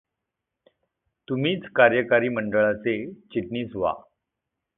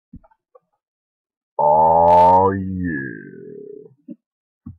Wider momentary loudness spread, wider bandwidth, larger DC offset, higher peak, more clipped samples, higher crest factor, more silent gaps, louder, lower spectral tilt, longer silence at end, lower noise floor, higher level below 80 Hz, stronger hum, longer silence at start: second, 13 LU vs 26 LU; second, 3.9 kHz vs 6 kHz; neither; about the same, -2 dBFS vs -4 dBFS; neither; first, 24 dB vs 14 dB; second, none vs 0.88-1.25 s, 1.37-1.57 s, 4.26-4.61 s; second, -24 LUFS vs -15 LUFS; about the same, -10 dB/octave vs -9 dB/octave; first, 0.75 s vs 0.1 s; first, -84 dBFS vs -57 dBFS; second, -60 dBFS vs -50 dBFS; neither; first, 1.3 s vs 0.15 s